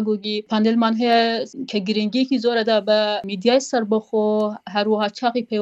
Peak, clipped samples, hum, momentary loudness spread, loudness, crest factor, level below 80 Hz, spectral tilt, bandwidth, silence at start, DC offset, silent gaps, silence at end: -4 dBFS; under 0.1%; none; 6 LU; -20 LUFS; 16 dB; -68 dBFS; -5 dB/octave; 8.2 kHz; 0 s; under 0.1%; none; 0 s